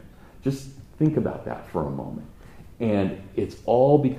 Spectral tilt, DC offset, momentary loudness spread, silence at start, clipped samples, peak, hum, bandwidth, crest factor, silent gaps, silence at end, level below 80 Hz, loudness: -8.5 dB/octave; under 0.1%; 15 LU; 0.05 s; under 0.1%; -4 dBFS; none; 14.5 kHz; 20 dB; none; 0 s; -50 dBFS; -25 LUFS